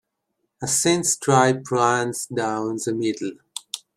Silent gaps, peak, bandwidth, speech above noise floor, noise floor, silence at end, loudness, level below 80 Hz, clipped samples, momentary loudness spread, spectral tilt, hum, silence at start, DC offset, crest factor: none; -2 dBFS; 15.5 kHz; 55 dB; -76 dBFS; 0.2 s; -21 LUFS; -64 dBFS; under 0.1%; 14 LU; -3.5 dB/octave; none; 0.6 s; under 0.1%; 22 dB